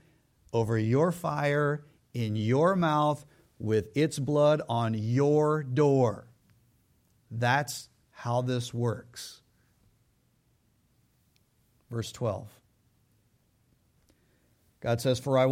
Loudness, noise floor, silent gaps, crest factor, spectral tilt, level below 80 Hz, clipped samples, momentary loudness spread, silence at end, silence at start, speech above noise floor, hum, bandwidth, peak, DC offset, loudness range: -28 LUFS; -69 dBFS; none; 16 dB; -6.5 dB/octave; -66 dBFS; under 0.1%; 15 LU; 0 s; 0.55 s; 42 dB; none; 16 kHz; -12 dBFS; under 0.1%; 14 LU